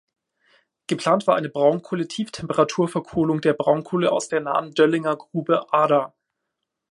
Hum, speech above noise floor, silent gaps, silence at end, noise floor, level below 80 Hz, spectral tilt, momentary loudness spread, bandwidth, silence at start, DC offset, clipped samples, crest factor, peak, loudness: none; 60 dB; none; 0.8 s; -81 dBFS; -62 dBFS; -5.5 dB/octave; 8 LU; 11.5 kHz; 0.9 s; under 0.1%; under 0.1%; 20 dB; -2 dBFS; -22 LUFS